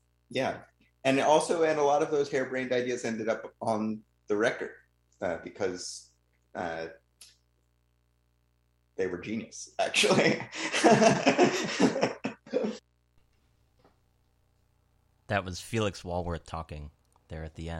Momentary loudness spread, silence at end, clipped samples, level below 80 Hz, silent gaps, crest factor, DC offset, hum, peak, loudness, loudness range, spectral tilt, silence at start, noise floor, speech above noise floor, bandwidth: 17 LU; 0 s; under 0.1%; -56 dBFS; none; 24 dB; under 0.1%; 60 Hz at -65 dBFS; -6 dBFS; -29 LUFS; 15 LU; -4 dB/octave; 0.3 s; -71 dBFS; 43 dB; 15.5 kHz